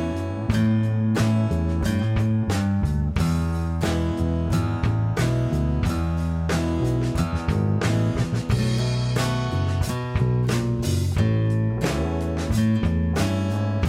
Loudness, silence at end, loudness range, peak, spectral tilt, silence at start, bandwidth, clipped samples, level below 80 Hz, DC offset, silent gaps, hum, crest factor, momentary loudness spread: -23 LUFS; 0 s; 1 LU; -8 dBFS; -7 dB/octave; 0 s; 15.5 kHz; under 0.1%; -32 dBFS; under 0.1%; none; none; 14 dB; 3 LU